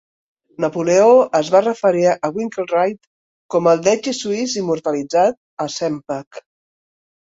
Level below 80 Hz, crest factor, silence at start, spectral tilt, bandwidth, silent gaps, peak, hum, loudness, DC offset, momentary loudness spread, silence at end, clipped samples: -62 dBFS; 16 dB; 0.6 s; -4.5 dB/octave; 7.8 kHz; 3.07-3.49 s, 5.37-5.57 s, 6.27-6.31 s; -2 dBFS; none; -17 LUFS; under 0.1%; 11 LU; 0.9 s; under 0.1%